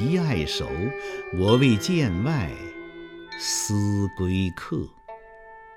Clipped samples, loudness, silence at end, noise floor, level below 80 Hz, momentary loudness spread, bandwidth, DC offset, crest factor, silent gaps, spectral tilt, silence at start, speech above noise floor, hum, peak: under 0.1%; -24 LUFS; 0 s; -46 dBFS; -46 dBFS; 20 LU; 16.5 kHz; under 0.1%; 20 dB; none; -5 dB/octave; 0 s; 22 dB; none; -6 dBFS